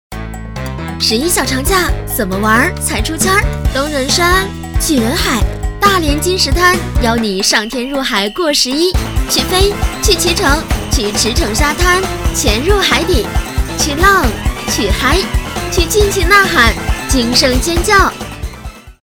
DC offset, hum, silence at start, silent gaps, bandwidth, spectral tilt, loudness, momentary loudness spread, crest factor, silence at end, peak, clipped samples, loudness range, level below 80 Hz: under 0.1%; none; 0.1 s; none; 19.5 kHz; -3.5 dB/octave; -12 LUFS; 9 LU; 12 dB; 0.1 s; 0 dBFS; 0.2%; 2 LU; -20 dBFS